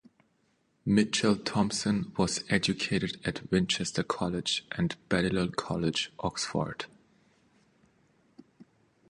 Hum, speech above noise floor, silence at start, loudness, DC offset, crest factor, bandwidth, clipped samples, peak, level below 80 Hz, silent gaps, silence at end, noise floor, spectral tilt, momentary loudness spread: none; 42 dB; 0.85 s; -30 LUFS; under 0.1%; 22 dB; 11.5 kHz; under 0.1%; -10 dBFS; -56 dBFS; none; 0.45 s; -72 dBFS; -4.5 dB/octave; 6 LU